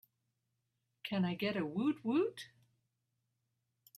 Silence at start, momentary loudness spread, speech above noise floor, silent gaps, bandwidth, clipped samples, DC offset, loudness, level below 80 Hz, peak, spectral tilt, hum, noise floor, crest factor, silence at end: 1.05 s; 15 LU; 49 dB; none; 14.5 kHz; under 0.1%; under 0.1%; -36 LUFS; -82 dBFS; -24 dBFS; -7 dB/octave; none; -85 dBFS; 16 dB; 1.5 s